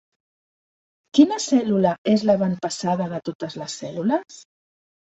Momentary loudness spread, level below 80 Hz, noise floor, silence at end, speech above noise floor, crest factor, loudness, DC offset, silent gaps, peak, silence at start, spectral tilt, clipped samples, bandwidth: 13 LU; -64 dBFS; under -90 dBFS; 0.65 s; over 69 dB; 20 dB; -22 LUFS; under 0.1%; 1.98-2.05 s, 3.35-3.40 s; -2 dBFS; 1.15 s; -5.5 dB/octave; under 0.1%; 8.2 kHz